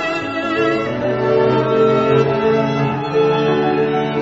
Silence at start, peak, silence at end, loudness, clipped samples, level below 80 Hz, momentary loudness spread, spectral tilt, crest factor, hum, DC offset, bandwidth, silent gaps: 0 s; -2 dBFS; 0 s; -16 LUFS; under 0.1%; -48 dBFS; 5 LU; -7 dB/octave; 14 dB; none; under 0.1%; 7.8 kHz; none